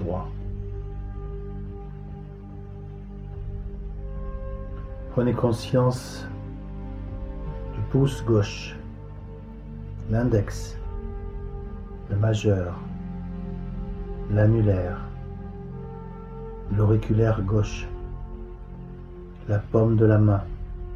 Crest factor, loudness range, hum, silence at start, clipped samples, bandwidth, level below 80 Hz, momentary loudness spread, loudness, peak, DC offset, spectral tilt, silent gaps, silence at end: 20 dB; 12 LU; none; 0 s; under 0.1%; 10.5 kHz; -36 dBFS; 18 LU; -27 LUFS; -6 dBFS; under 0.1%; -8 dB/octave; none; 0 s